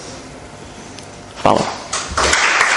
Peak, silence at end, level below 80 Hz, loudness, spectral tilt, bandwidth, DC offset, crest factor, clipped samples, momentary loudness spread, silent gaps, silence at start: 0 dBFS; 0 s; -38 dBFS; -16 LUFS; -2 dB/octave; 11.5 kHz; under 0.1%; 18 dB; under 0.1%; 22 LU; none; 0 s